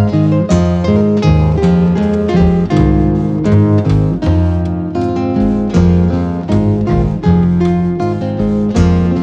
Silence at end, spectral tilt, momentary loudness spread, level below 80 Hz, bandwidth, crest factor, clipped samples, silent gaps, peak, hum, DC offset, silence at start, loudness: 0 s; -9 dB/octave; 5 LU; -24 dBFS; 8 kHz; 10 dB; under 0.1%; none; 0 dBFS; none; under 0.1%; 0 s; -12 LUFS